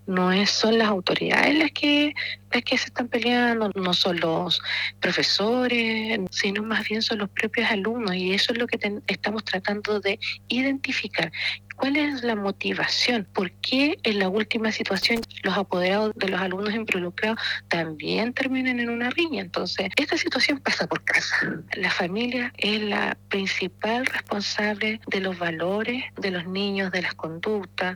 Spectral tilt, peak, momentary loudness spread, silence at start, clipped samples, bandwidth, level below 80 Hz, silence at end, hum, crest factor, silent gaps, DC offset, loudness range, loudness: -4 dB/octave; -4 dBFS; 6 LU; 0.05 s; under 0.1%; 19.5 kHz; -62 dBFS; 0 s; none; 22 dB; none; under 0.1%; 3 LU; -24 LUFS